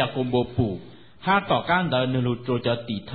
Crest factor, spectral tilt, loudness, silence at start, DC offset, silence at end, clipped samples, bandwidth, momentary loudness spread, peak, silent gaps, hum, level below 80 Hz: 16 dB; -11 dB/octave; -24 LUFS; 0 s; 0.3%; 0 s; under 0.1%; 4.8 kHz; 7 LU; -8 dBFS; none; none; -48 dBFS